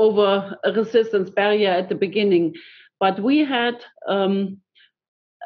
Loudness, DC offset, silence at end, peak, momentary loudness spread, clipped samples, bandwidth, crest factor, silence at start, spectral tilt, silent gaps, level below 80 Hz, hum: -20 LUFS; under 0.1%; 0 s; -4 dBFS; 7 LU; under 0.1%; 6.2 kHz; 16 dB; 0 s; -3.5 dB/octave; 5.08-5.40 s; -78 dBFS; none